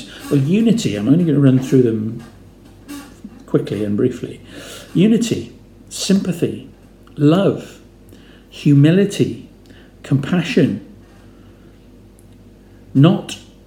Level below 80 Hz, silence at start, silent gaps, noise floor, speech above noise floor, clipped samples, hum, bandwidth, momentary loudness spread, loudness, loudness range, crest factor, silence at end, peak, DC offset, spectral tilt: -50 dBFS; 0 s; none; -44 dBFS; 29 dB; under 0.1%; none; 15.5 kHz; 21 LU; -16 LUFS; 5 LU; 18 dB; 0.25 s; 0 dBFS; under 0.1%; -7 dB/octave